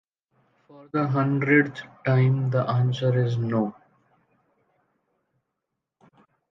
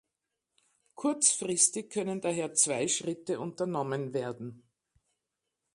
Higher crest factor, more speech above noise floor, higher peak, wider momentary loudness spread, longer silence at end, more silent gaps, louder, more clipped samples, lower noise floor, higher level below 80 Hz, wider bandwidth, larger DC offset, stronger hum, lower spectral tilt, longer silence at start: about the same, 20 dB vs 22 dB; first, 60 dB vs 55 dB; first, -6 dBFS vs -10 dBFS; about the same, 10 LU vs 11 LU; first, 2.8 s vs 1.15 s; neither; first, -24 LUFS vs -29 LUFS; neither; about the same, -83 dBFS vs -86 dBFS; first, -68 dBFS vs -76 dBFS; second, 6 kHz vs 11.5 kHz; neither; neither; first, -8.5 dB/octave vs -3 dB/octave; second, 0.8 s vs 0.95 s